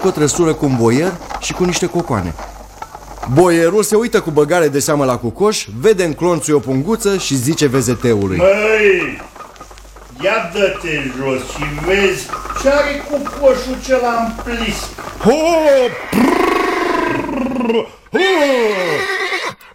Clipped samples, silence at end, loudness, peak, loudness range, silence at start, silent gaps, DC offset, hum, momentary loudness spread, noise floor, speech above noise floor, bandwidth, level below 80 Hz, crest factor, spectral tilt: under 0.1%; 0.2 s; -15 LUFS; 0 dBFS; 3 LU; 0 s; none; under 0.1%; none; 10 LU; -36 dBFS; 22 dB; 16.5 kHz; -36 dBFS; 14 dB; -4.5 dB/octave